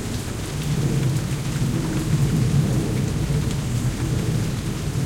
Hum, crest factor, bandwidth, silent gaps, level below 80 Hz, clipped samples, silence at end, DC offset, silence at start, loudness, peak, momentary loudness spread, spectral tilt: none; 14 dB; 16.5 kHz; none; -34 dBFS; under 0.1%; 0 s; under 0.1%; 0 s; -23 LUFS; -8 dBFS; 6 LU; -6 dB/octave